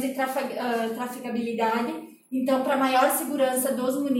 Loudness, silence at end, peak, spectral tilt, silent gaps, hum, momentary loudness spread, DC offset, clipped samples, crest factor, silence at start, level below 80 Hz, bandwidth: -25 LUFS; 0 s; -8 dBFS; -3.5 dB/octave; none; none; 9 LU; under 0.1%; under 0.1%; 18 dB; 0 s; -78 dBFS; 16.5 kHz